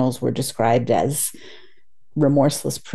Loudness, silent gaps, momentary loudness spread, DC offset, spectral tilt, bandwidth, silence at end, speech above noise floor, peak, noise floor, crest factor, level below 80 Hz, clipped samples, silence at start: -20 LUFS; none; 9 LU; 1%; -5.5 dB/octave; 13 kHz; 0 s; 43 dB; -4 dBFS; -63 dBFS; 16 dB; -54 dBFS; under 0.1%; 0 s